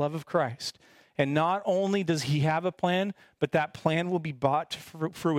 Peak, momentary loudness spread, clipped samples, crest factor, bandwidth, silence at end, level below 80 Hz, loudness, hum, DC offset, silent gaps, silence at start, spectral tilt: -8 dBFS; 9 LU; under 0.1%; 20 dB; 16 kHz; 0 s; -68 dBFS; -29 LUFS; none; under 0.1%; none; 0 s; -6 dB/octave